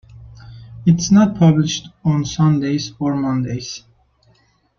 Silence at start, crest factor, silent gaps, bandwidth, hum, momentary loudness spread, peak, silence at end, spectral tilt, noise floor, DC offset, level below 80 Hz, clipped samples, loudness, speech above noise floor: 0.15 s; 16 dB; none; 7.2 kHz; none; 13 LU; -2 dBFS; 1 s; -6 dB/octave; -57 dBFS; under 0.1%; -48 dBFS; under 0.1%; -17 LUFS; 41 dB